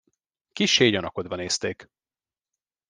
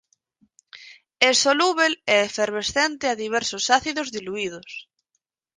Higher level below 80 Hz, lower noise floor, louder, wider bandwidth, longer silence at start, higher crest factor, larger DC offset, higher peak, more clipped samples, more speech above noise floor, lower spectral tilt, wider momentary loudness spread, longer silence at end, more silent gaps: about the same, -64 dBFS vs -60 dBFS; first, under -90 dBFS vs -77 dBFS; about the same, -23 LUFS vs -21 LUFS; about the same, 11 kHz vs 10 kHz; second, 0.55 s vs 0.75 s; about the same, 24 dB vs 24 dB; neither; second, -4 dBFS vs 0 dBFS; neither; first, over 66 dB vs 55 dB; first, -3 dB/octave vs -1 dB/octave; first, 18 LU vs 12 LU; first, 1.05 s vs 0.75 s; neither